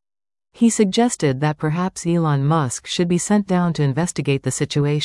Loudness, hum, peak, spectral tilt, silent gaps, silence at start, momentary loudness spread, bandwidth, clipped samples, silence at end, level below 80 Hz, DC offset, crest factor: -19 LUFS; none; -4 dBFS; -5.5 dB/octave; none; 0.6 s; 5 LU; 12 kHz; under 0.1%; 0 s; -52 dBFS; under 0.1%; 16 dB